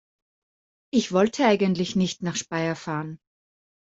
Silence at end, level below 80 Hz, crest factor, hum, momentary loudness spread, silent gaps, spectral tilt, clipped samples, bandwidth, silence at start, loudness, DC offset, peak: 0.75 s; -64 dBFS; 20 dB; none; 10 LU; none; -5 dB/octave; under 0.1%; 7.8 kHz; 0.95 s; -24 LUFS; under 0.1%; -6 dBFS